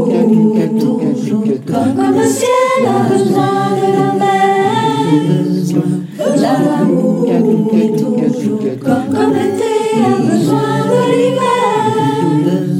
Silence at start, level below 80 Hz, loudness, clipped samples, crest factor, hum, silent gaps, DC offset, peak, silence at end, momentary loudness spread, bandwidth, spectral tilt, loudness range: 0 s; -64 dBFS; -13 LUFS; under 0.1%; 12 dB; none; none; under 0.1%; 0 dBFS; 0 s; 4 LU; 15.5 kHz; -6.5 dB/octave; 1 LU